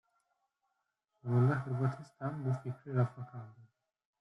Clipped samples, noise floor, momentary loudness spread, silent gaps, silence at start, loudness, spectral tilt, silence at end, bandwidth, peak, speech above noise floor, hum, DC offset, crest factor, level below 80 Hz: under 0.1%; -84 dBFS; 17 LU; none; 1.25 s; -35 LUFS; -10 dB/octave; 0.55 s; 5.8 kHz; -20 dBFS; 50 dB; none; under 0.1%; 18 dB; -72 dBFS